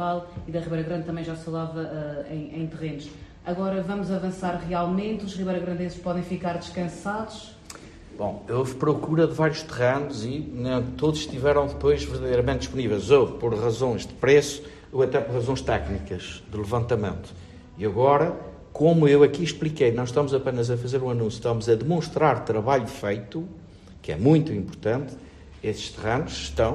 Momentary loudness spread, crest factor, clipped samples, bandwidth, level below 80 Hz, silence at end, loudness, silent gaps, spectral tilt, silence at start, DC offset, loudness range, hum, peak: 14 LU; 20 dB; under 0.1%; 12.5 kHz; -46 dBFS; 0 s; -25 LUFS; none; -6.5 dB/octave; 0 s; under 0.1%; 8 LU; none; -4 dBFS